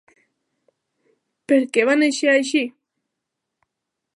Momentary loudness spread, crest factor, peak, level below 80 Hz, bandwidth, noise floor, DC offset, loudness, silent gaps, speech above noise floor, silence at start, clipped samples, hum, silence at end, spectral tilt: 6 LU; 20 dB; -2 dBFS; -82 dBFS; 11.5 kHz; -81 dBFS; under 0.1%; -18 LUFS; none; 63 dB; 1.5 s; under 0.1%; none; 1.45 s; -2.5 dB/octave